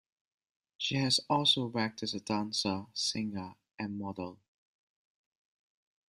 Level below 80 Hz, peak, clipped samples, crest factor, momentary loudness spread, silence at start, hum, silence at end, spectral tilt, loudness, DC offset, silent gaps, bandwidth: -72 dBFS; -14 dBFS; under 0.1%; 22 dB; 16 LU; 0.8 s; none; 1.75 s; -3.5 dB/octave; -32 LUFS; under 0.1%; 3.74-3.78 s; 13 kHz